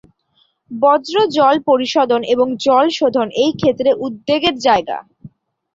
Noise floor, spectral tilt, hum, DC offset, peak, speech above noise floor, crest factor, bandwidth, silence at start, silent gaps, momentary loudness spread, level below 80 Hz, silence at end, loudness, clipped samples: -61 dBFS; -4.5 dB/octave; none; under 0.1%; -2 dBFS; 46 dB; 14 dB; 7.8 kHz; 0.7 s; none; 5 LU; -54 dBFS; 0.5 s; -15 LUFS; under 0.1%